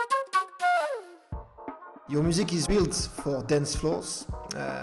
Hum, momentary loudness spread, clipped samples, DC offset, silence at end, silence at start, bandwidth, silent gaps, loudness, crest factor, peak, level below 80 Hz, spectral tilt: none; 17 LU; under 0.1%; under 0.1%; 0 s; 0 s; 12.5 kHz; none; -28 LUFS; 16 dB; -12 dBFS; -44 dBFS; -4.5 dB/octave